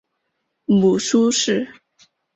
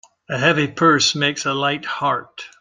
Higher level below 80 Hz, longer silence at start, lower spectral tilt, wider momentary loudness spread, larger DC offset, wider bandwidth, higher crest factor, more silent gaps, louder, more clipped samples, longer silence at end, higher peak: about the same, -60 dBFS vs -60 dBFS; first, 0.7 s vs 0.3 s; about the same, -4.5 dB/octave vs -3.5 dB/octave; first, 14 LU vs 10 LU; neither; second, 8.4 kHz vs 10 kHz; about the same, 14 dB vs 18 dB; neither; about the same, -18 LUFS vs -18 LUFS; neither; first, 0.65 s vs 0.15 s; second, -6 dBFS vs -2 dBFS